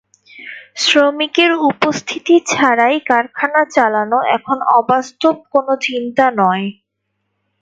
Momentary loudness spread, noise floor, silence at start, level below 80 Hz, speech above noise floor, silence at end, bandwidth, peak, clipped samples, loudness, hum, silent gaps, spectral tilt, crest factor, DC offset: 7 LU; -72 dBFS; 0.4 s; -64 dBFS; 58 dB; 0.9 s; 9.2 kHz; 0 dBFS; under 0.1%; -14 LUFS; none; none; -3.5 dB/octave; 14 dB; under 0.1%